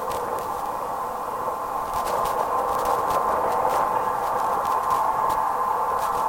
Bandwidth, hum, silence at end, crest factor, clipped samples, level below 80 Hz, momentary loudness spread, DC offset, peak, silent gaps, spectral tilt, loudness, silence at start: 17 kHz; none; 0 s; 14 dB; under 0.1%; -50 dBFS; 6 LU; under 0.1%; -10 dBFS; none; -3.5 dB/octave; -24 LUFS; 0 s